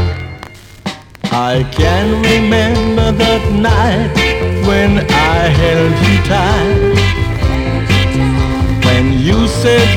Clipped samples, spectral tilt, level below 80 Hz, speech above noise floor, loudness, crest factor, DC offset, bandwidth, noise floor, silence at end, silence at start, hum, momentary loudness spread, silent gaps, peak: under 0.1%; -6 dB/octave; -20 dBFS; 22 dB; -12 LUFS; 10 dB; under 0.1%; 16 kHz; -32 dBFS; 0 s; 0 s; none; 7 LU; none; -2 dBFS